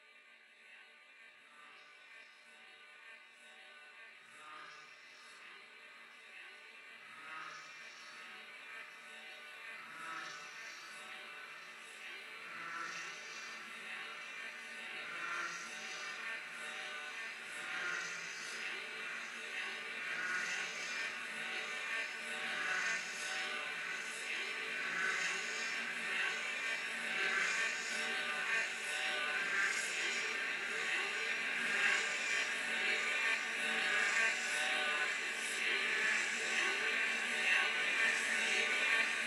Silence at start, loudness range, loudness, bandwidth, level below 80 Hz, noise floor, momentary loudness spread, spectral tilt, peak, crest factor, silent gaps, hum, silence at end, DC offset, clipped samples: 0 s; 20 LU; -37 LUFS; 16.5 kHz; under -90 dBFS; -62 dBFS; 22 LU; 0.5 dB/octave; -20 dBFS; 20 dB; none; none; 0 s; under 0.1%; under 0.1%